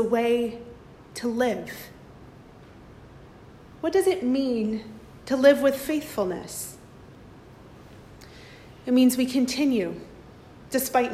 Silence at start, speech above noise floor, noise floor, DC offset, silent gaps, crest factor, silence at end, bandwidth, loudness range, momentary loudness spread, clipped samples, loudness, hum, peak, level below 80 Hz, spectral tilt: 0 s; 24 dB; -48 dBFS; under 0.1%; none; 20 dB; 0 s; 15.5 kHz; 8 LU; 25 LU; under 0.1%; -24 LUFS; none; -6 dBFS; -56 dBFS; -4.5 dB/octave